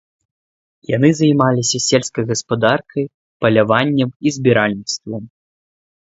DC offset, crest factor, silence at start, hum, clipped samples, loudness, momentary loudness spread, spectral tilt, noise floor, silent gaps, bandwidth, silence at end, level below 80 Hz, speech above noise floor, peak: under 0.1%; 18 dB; 0.9 s; none; under 0.1%; -16 LUFS; 11 LU; -5 dB/octave; under -90 dBFS; 3.14-3.40 s, 4.16-4.20 s; 8 kHz; 0.85 s; -54 dBFS; over 74 dB; 0 dBFS